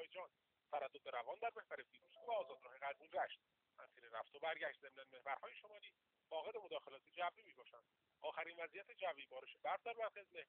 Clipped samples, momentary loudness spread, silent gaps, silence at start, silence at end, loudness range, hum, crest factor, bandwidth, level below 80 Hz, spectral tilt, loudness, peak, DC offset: under 0.1%; 15 LU; none; 0 s; 0.05 s; 3 LU; none; 20 dB; 4.3 kHz; under -90 dBFS; 1.5 dB/octave; -50 LUFS; -30 dBFS; under 0.1%